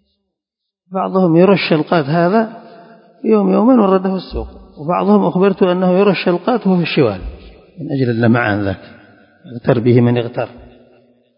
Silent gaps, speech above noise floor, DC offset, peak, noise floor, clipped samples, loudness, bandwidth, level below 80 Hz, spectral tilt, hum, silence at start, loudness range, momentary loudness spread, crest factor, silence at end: none; 67 dB; under 0.1%; 0 dBFS; -80 dBFS; under 0.1%; -14 LUFS; 5.4 kHz; -40 dBFS; -12.5 dB/octave; none; 0.9 s; 3 LU; 16 LU; 14 dB; 0.75 s